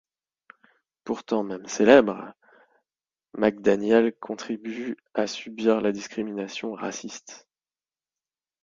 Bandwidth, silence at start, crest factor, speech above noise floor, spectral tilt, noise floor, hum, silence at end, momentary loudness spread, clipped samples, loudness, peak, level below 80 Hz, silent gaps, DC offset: 7.6 kHz; 1.05 s; 26 dB; over 66 dB; -4.5 dB/octave; under -90 dBFS; none; 1.3 s; 20 LU; under 0.1%; -25 LUFS; 0 dBFS; -66 dBFS; none; under 0.1%